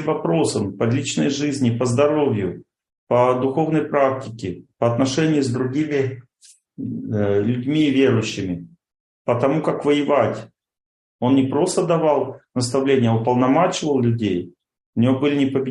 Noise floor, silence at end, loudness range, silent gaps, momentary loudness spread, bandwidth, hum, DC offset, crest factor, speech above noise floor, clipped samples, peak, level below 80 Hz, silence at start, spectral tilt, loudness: -53 dBFS; 0 s; 3 LU; 2.98-3.07 s, 9.00-9.25 s, 10.86-11.19 s, 14.86-14.93 s; 11 LU; 11.5 kHz; none; under 0.1%; 16 dB; 34 dB; under 0.1%; -4 dBFS; -60 dBFS; 0 s; -6 dB/octave; -20 LUFS